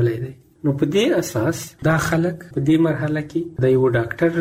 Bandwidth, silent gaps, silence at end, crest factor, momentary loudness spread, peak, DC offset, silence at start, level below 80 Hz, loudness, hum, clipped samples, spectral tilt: 16 kHz; none; 0 s; 14 dB; 7 LU; -6 dBFS; under 0.1%; 0 s; -48 dBFS; -20 LUFS; none; under 0.1%; -6.5 dB/octave